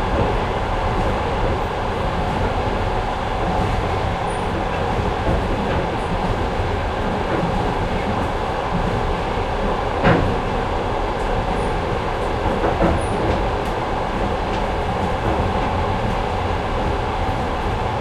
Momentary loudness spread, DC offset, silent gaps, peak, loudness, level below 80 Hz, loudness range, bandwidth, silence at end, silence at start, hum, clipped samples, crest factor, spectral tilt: 3 LU; under 0.1%; none; -2 dBFS; -21 LUFS; -28 dBFS; 1 LU; 12.5 kHz; 0 s; 0 s; none; under 0.1%; 18 dB; -6.5 dB/octave